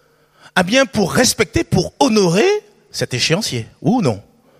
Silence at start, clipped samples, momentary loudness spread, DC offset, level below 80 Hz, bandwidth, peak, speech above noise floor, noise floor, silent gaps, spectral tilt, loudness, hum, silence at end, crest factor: 0.55 s; under 0.1%; 9 LU; under 0.1%; -42 dBFS; 15.5 kHz; 0 dBFS; 33 dB; -49 dBFS; none; -4 dB/octave; -16 LUFS; none; 0.4 s; 16 dB